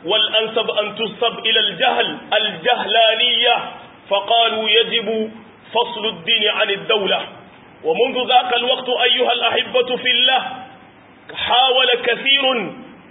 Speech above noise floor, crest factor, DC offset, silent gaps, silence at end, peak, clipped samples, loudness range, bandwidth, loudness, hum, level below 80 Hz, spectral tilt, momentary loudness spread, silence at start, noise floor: 27 dB; 16 dB; under 0.1%; none; 0.15 s; -2 dBFS; under 0.1%; 2 LU; 4 kHz; -16 LUFS; none; -64 dBFS; -7.5 dB/octave; 10 LU; 0 s; -45 dBFS